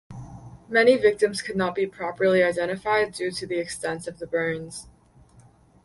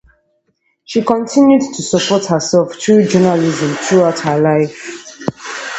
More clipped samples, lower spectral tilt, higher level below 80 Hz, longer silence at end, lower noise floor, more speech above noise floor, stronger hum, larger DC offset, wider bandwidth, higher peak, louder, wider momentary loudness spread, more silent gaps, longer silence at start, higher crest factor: neither; about the same, -4.5 dB/octave vs -5 dB/octave; about the same, -58 dBFS vs -54 dBFS; first, 1 s vs 0 s; second, -54 dBFS vs -63 dBFS; second, 31 dB vs 51 dB; neither; neither; first, 11.5 kHz vs 8.2 kHz; second, -6 dBFS vs 0 dBFS; second, -24 LUFS vs -13 LUFS; first, 20 LU vs 13 LU; neither; second, 0.1 s vs 0.9 s; first, 20 dB vs 14 dB